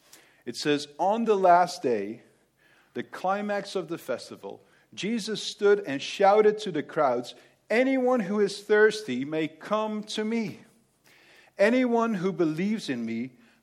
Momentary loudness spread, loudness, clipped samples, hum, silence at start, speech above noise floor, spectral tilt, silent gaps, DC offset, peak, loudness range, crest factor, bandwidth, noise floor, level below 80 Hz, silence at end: 16 LU; -26 LUFS; under 0.1%; none; 0.45 s; 37 dB; -5 dB/octave; none; under 0.1%; -8 dBFS; 6 LU; 18 dB; 14 kHz; -63 dBFS; -80 dBFS; 0.35 s